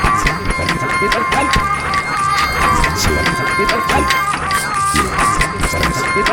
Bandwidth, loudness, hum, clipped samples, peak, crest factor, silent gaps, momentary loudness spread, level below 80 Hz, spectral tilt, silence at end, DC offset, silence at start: over 20 kHz; -15 LUFS; none; under 0.1%; 0 dBFS; 14 dB; none; 3 LU; -26 dBFS; -3.5 dB/octave; 0 s; under 0.1%; 0 s